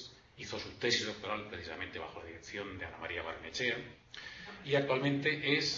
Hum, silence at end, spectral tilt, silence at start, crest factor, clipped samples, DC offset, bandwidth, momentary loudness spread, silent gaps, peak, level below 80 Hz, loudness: none; 0 s; -2.5 dB/octave; 0 s; 22 dB; under 0.1%; under 0.1%; 7.4 kHz; 16 LU; none; -16 dBFS; -64 dBFS; -36 LUFS